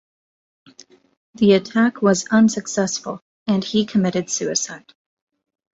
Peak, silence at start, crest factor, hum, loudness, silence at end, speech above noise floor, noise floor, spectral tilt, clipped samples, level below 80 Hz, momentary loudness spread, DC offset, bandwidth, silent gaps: -4 dBFS; 1.4 s; 18 dB; none; -19 LUFS; 1 s; 31 dB; -49 dBFS; -4.5 dB/octave; under 0.1%; -60 dBFS; 12 LU; under 0.1%; 8 kHz; 3.22-3.46 s